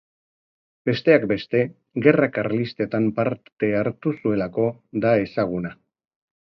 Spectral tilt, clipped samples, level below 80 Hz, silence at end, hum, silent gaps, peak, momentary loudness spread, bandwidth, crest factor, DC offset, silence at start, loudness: -9 dB/octave; under 0.1%; -58 dBFS; 0.85 s; none; 3.52-3.56 s; -2 dBFS; 8 LU; 6 kHz; 22 dB; under 0.1%; 0.85 s; -22 LUFS